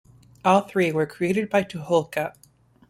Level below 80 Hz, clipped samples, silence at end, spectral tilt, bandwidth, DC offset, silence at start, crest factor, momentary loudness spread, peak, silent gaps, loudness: -62 dBFS; under 0.1%; 0.6 s; -6 dB/octave; 16 kHz; under 0.1%; 0.45 s; 20 dB; 9 LU; -4 dBFS; none; -23 LUFS